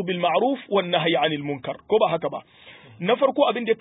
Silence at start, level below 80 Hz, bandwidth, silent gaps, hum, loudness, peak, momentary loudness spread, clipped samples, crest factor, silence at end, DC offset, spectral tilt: 0 s; -68 dBFS; 4 kHz; none; none; -23 LUFS; -6 dBFS; 10 LU; under 0.1%; 16 dB; 0.05 s; under 0.1%; -10 dB/octave